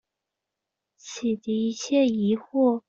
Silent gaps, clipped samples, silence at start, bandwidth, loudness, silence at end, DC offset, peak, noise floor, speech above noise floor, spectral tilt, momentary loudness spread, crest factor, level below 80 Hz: none; under 0.1%; 1.05 s; 7.6 kHz; -25 LUFS; 0.1 s; under 0.1%; -10 dBFS; -85 dBFS; 62 dB; -5.5 dB/octave; 7 LU; 16 dB; -70 dBFS